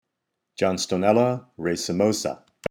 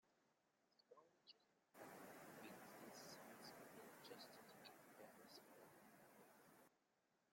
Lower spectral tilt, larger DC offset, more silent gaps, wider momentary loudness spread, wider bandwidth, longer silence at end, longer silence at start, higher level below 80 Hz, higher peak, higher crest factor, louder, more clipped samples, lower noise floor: first, -5 dB/octave vs -3 dB/octave; neither; neither; first, 11 LU vs 8 LU; about the same, 17.5 kHz vs 16.5 kHz; about the same, 0.05 s vs 0 s; first, 0.6 s vs 0.05 s; first, -60 dBFS vs under -90 dBFS; first, -6 dBFS vs -46 dBFS; about the same, 20 dB vs 18 dB; first, -24 LUFS vs -63 LUFS; neither; second, -80 dBFS vs -86 dBFS